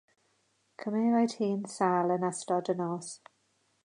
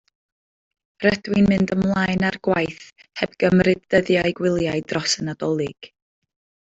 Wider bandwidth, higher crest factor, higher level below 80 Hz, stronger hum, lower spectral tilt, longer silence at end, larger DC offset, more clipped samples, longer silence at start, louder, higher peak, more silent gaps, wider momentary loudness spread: first, 11 kHz vs 8 kHz; about the same, 18 dB vs 18 dB; second, -82 dBFS vs -50 dBFS; neither; about the same, -6 dB/octave vs -5.5 dB/octave; second, 0.7 s vs 0.85 s; neither; neither; second, 0.8 s vs 1 s; second, -30 LUFS vs -21 LUFS; second, -12 dBFS vs -4 dBFS; neither; first, 13 LU vs 10 LU